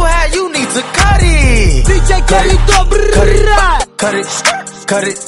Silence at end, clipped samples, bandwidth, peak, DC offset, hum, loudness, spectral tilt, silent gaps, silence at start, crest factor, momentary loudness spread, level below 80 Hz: 0 s; 0.2%; 11.5 kHz; 0 dBFS; under 0.1%; none; -11 LUFS; -4 dB/octave; none; 0 s; 10 dB; 5 LU; -12 dBFS